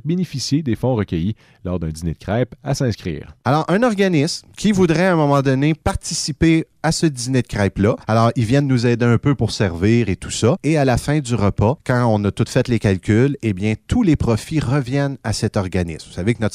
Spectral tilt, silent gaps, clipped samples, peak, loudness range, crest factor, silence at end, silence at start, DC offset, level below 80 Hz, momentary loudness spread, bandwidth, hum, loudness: -6 dB/octave; none; under 0.1%; -2 dBFS; 3 LU; 14 dB; 0 s; 0.05 s; under 0.1%; -38 dBFS; 7 LU; 14 kHz; none; -18 LUFS